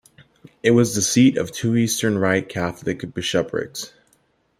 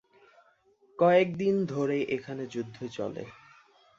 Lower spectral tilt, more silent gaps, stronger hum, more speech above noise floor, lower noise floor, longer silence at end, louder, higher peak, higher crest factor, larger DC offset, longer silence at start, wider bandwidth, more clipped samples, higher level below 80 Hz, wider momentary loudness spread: second, -4.5 dB/octave vs -7 dB/octave; neither; neither; first, 43 dB vs 37 dB; about the same, -63 dBFS vs -65 dBFS; about the same, 0.7 s vs 0.65 s; first, -20 LUFS vs -29 LUFS; first, -2 dBFS vs -10 dBFS; about the same, 18 dB vs 20 dB; neither; second, 0.65 s vs 1 s; first, 16 kHz vs 7.6 kHz; neither; first, -56 dBFS vs -70 dBFS; second, 11 LU vs 17 LU